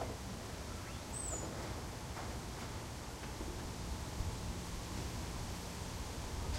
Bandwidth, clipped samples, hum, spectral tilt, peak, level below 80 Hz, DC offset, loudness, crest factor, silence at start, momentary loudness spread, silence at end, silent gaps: 16 kHz; under 0.1%; none; -4 dB/octave; -26 dBFS; -48 dBFS; under 0.1%; -44 LUFS; 16 dB; 0 s; 4 LU; 0 s; none